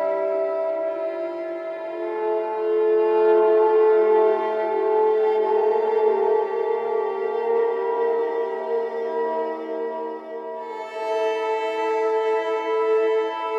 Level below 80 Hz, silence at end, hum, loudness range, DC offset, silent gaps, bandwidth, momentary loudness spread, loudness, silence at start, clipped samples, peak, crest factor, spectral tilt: under -90 dBFS; 0 s; none; 7 LU; under 0.1%; none; 6.6 kHz; 12 LU; -22 LUFS; 0 s; under 0.1%; -8 dBFS; 14 dB; -4.5 dB/octave